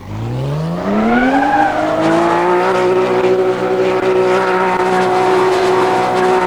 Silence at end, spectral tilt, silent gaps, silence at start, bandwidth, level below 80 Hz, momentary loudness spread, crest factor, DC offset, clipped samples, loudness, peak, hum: 0 s; -6 dB/octave; none; 0 s; 12.5 kHz; -42 dBFS; 5 LU; 12 dB; 0.4%; under 0.1%; -13 LUFS; 0 dBFS; none